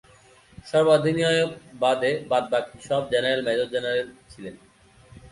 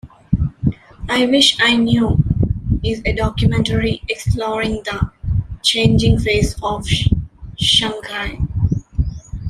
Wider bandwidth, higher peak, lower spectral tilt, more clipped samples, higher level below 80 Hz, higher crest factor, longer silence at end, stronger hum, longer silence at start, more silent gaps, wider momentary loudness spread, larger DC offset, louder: second, 11.5 kHz vs 14.5 kHz; second, -6 dBFS vs 0 dBFS; about the same, -5 dB/octave vs -5 dB/octave; neither; second, -60 dBFS vs -28 dBFS; about the same, 18 dB vs 18 dB; about the same, 0.05 s vs 0 s; neither; first, 0.65 s vs 0.05 s; neither; first, 18 LU vs 10 LU; neither; second, -23 LUFS vs -17 LUFS